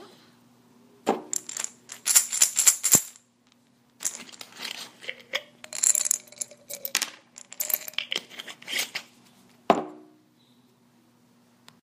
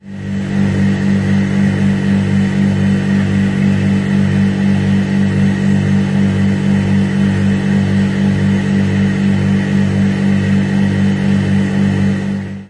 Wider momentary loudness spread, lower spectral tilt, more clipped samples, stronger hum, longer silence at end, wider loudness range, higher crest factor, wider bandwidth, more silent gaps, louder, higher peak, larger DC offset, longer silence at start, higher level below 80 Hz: first, 20 LU vs 1 LU; second, 0 dB/octave vs -7.5 dB/octave; neither; second, none vs 50 Hz at -20 dBFS; first, 1.85 s vs 0.05 s; first, 9 LU vs 0 LU; first, 30 dB vs 10 dB; first, 15.5 kHz vs 10.5 kHz; neither; second, -25 LUFS vs -14 LUFS; about the same, 0 dBFS vs -2 dBFS; neither; about the same, 0 s vs 0.05 s; second, -74 dBFS vs -40 dBFS